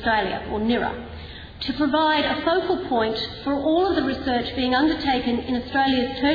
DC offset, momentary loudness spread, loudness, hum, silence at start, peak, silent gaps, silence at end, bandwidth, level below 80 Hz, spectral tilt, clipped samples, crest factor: under 0.1%; 9 LU; -22 LUFS; none; 0 s; -8 dBFS; none; 0 s; 5 kHz; -44 dBFS; -7 dB/octave; under 0.1%; 14 dB